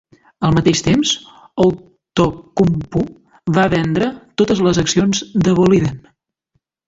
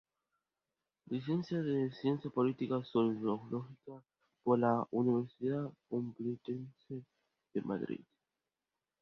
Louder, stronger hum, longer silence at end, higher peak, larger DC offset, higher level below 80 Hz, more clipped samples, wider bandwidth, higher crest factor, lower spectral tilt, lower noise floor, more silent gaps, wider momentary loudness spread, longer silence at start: first, -16 LUFS vs -36 LUFS; neither; second, 0.9 s vs 1.05 s; first, -2 dBFS vs -18 dBFS; neither; first, -40 dBFS vs -78 dBFS; neither; first, 7.8 kHz vs 6.2 kHz; about the same, 16 dB vs 20 dB; second, -5.5 dB/octave vs -7.5 dB/octave; second, -68 dBFS vs under -90 dBFS; neither; second, 9 LU vs 15 LU; second, 0.4 s vs 1.1 s